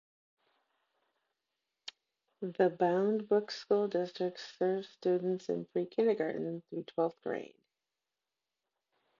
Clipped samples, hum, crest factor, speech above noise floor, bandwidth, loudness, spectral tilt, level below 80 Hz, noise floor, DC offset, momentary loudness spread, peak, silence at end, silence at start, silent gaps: under 0.1%; none; 20 dB; over 57 dB; 7.4 kHz; -34 LUFS; -7 dB/octave; -86 dBFS; under -90 dBFS; under 0.1%; 13 LU; -16 dBFS; 1.75 s; 1.85 s; none